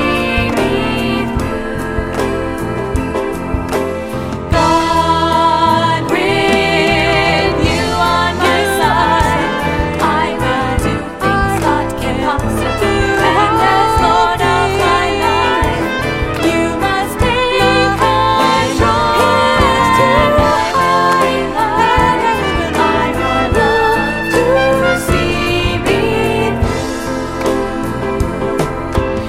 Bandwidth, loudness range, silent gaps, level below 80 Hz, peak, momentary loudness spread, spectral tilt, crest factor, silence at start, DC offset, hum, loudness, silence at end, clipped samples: 16.5 kHz; 5 LU; none; -26 dBFS; 0 dBFS; 7 LU; -5 dB/octave; 14 dB; 0 s; under 0.1%; none; -13 LUFS; 0 s; under 0.1%